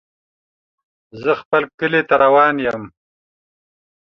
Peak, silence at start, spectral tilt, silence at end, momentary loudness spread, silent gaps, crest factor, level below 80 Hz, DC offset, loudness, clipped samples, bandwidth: -2 dBFS; 1.15 s; -7 dB/octave; 1.2 s; 11 LU; 1.45-1.51 s, 1.74-1.78 s; 18 dB; -60 dBFS; under 0.1%; -16 LUFS; under 0.1%; 6.4 kHz